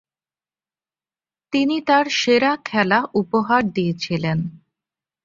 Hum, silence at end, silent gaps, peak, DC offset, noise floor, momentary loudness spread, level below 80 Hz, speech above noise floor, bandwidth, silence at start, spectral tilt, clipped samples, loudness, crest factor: none; 0.7 s; none; -2 dBFS; under 0.1%; under -90 dBFS; 7 LU; -58 dBFS; over 71 dB; 7.6 kHz; 1.5 s; -5.5 dB/octave; under 0.1%; -19 LUFS; 20 dB